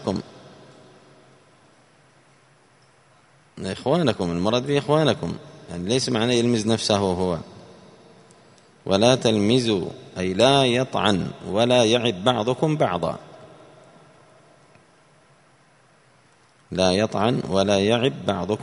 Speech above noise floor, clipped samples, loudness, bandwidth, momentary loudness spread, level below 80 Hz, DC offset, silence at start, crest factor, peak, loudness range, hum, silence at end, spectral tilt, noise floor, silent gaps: 36 dB; under 0.1%; -21 LUFS; 11 kHz; 14 LU; -56 dBFS; under 0.1%; 0 s; 22 dB; -2 dBFS; 9 LU; none; 0 s; -5 dB/octave; -57 dBFS; none